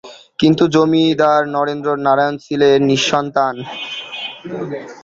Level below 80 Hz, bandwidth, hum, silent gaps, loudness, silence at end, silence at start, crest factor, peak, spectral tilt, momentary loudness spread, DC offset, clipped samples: -56 dBFS; 7.8 kHz; none; none; -15 LUFS; 0.05 s; 0.05 s; 14 dB; -2 dBFS; -5 dB/octave; 13 LU; under 0.1%; under 0.1%